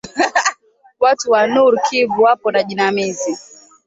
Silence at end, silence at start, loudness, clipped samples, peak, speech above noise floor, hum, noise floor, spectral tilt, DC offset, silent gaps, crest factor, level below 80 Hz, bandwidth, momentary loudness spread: 0.45 s; 0.05 s; -15 LUFS; under 0.1%; -2 dBFS; 31 dB; none; -46 dBFS; -3 dB/octave; under 0.1%; none; 14 dB; -62 dBFS; 8 kHz; 8 LU